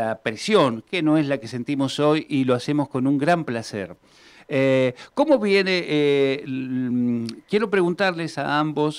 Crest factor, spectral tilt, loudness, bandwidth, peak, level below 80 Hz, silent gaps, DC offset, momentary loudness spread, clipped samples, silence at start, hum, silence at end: 14 dB; -6 dB/octave; -22 LUFS; 12 kHz; -8 dBFS; -64 dBFS; none; under 0.1%; 8 LU; under 0.1%; 0 s; none; 0 s